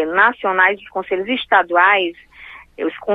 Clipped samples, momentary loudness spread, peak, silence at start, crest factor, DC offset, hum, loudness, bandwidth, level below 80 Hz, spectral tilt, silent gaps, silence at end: under 0.1%; 12 LU; 0 dBFS; 0 s; 18 dB; under 0.1%; none; -16 LUFS; 5.2 kHz; -56 dBFS; -6 dB/octave; none; 0 s